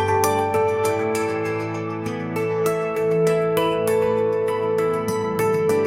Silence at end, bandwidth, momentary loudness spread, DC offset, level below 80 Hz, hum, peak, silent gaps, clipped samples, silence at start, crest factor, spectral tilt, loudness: 0 s; 16.5 kHz; 6 LU; 0.1%; -58 dBFS; none; -4 dBFS; none; under 0.1%; 0 s; 16 dB; -5.5 dB/octave; -21 LUFS